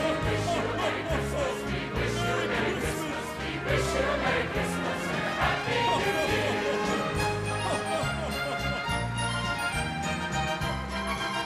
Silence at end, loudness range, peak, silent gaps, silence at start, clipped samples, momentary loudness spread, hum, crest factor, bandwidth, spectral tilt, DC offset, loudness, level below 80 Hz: 0 s; 2 LU; -14 dBFS; none; 0 s; under 0.1%; 4 LU; none; 16 dB; 14.5 kHz; -4.5 dB/octave; under 0.1%; -29 LUFS; -42 dBFS